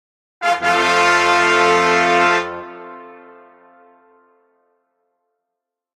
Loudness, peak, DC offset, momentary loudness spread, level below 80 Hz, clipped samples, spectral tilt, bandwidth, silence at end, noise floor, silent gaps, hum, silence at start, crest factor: -14 LUFS; -2 dBFS; under 0.1%; 20 LU; -60 dBFS; under 0.1%; -2.5 dB/octave; 14 kHz; 2.8 s; -82 dBFS; none; none; 0.4 s; 18 dB